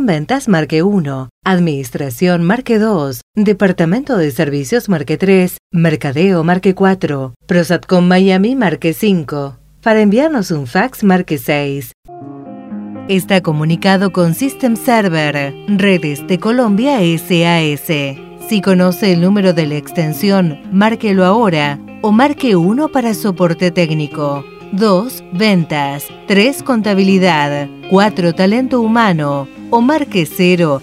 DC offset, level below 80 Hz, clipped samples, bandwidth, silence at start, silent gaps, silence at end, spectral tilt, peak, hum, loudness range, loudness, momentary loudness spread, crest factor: under 0.1%; -50 dBFS; under 0.1%; 15.5 kHz; 0 s; 1.31-1.42 s, 3.23-3.34 s, 5.59-5.70 s, 7.36-7.40 s, 11.94-12.03 s; 0 s; -6.5 dB/octave; 0 dBFS; none; 2 LU; -13 LUFS; 8 LU; 12 dB